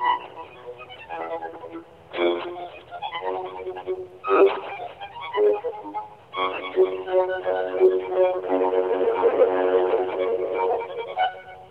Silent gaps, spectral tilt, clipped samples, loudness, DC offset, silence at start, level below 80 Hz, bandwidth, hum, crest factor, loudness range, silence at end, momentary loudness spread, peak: none; -6.5 dB/octave; under 0.1%; -24 LUFS; under 0.1%; 0 s; -66 dBFS; 4.6 kHz; none; 18 dB; 9 LU; 0 s; 17 LU; -6 dBFS